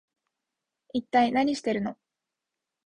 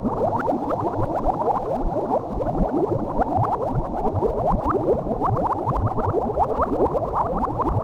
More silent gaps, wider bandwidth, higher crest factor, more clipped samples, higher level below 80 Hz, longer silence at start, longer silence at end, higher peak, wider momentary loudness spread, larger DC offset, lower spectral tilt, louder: neither; about the same, 10.5 kHz vs 11.5 kHz; first, 20 dB vs 12 dB; neither; second, -66 dBFS vs -32 dBFS; first, 0.95 s vs 0 s; first, 0.95 s vs 0 s; about the same, -10 dBFS vs -10 dBFS; first, 11 LU vs 3 LU; neither; second, -5 dB/octave vs -10 dB/octave; second, -27 LUFS vs -23 LUFS